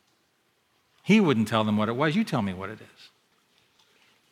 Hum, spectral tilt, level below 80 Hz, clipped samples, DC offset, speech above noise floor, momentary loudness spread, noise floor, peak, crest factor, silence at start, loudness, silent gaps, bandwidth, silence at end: none; -6.5 dB/octave; -72 dBFS; under 0.1%; under 0.1%; 45 dB; 18 LU; -70 dBFS; -8 dBFS; 20 dB; 1.05 s; -24 LUFS; none; 14 kHz; 1.45 s